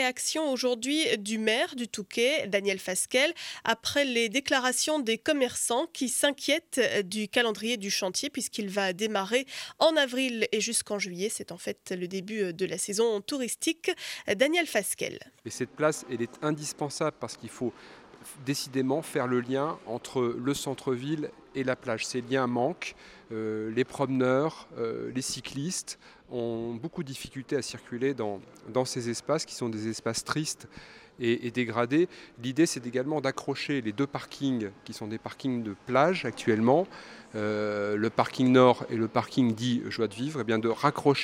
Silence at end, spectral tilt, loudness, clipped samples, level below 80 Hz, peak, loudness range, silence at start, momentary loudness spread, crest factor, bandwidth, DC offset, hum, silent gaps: 0 s; -4 dB/octave; -29 LUFS; under 0.1%; -68 dBFS; -8 dBFS; 6 LU; 0 s; 11 LU; 22 dB; 16.5 kHz; under 0.1%; none; none